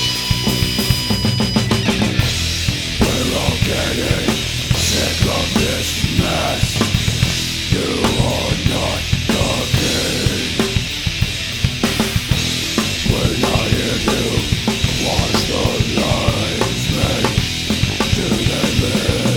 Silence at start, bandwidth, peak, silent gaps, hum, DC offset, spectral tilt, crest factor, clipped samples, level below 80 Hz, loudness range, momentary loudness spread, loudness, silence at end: 0 s; 19.5 kHz; 0 dBFS; none; none; under 0.1%; -4 dB/octave; 16 dB; under 0.1%; -28 dBFS; 1 LU; 2 LU; -17 LUFS; 0 s